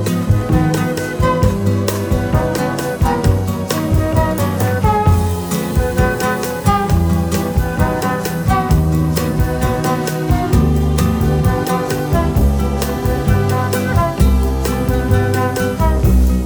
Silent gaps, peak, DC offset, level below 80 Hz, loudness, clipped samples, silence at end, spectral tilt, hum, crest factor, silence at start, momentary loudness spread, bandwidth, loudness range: none; 0 dBFS; under 0.1%; -20 dBFS; -16 LUFS; under 0.1%; 0 s; -6.5 dB/octave; none; 14 dB; 0 s; 4 LU; over 20 kHz; 1 LU